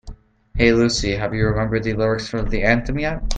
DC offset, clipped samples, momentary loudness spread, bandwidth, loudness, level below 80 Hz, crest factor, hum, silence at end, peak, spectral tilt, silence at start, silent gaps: under 0.1%; under 0.1%; 8 LU; 9.4 kHz; -20 LUFS; -28 dBFS; 18 dB; none; 0 s; 0 dBFS; -5.5 dB/octave; 0.05 s; none